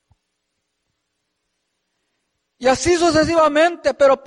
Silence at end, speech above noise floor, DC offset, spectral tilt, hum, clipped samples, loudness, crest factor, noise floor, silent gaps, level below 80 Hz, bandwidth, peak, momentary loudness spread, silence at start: 0.1 s; 59 dB; under 0.1%; -4 dB/octave; none; under 0.1%; -16 LUFS; 16 dB; -74 dBFS; none; -46 dBFS; 11.5 kHz; -4 dBFS; 4 LU; 2.6 s